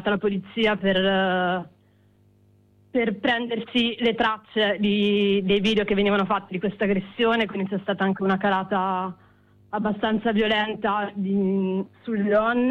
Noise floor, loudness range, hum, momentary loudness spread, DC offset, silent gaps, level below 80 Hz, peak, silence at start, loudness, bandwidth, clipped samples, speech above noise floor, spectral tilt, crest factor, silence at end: -59 dBFS; 3 LU; 50 Hz at -50 dBFS; 6 LU; under 0.1%; none; -54 dBFS; -10 dBFS; 0 s; -23 LUFS; 7 kHz; under 0.1%; 36 dB; -7 dB/octave; 12 dB; 0 s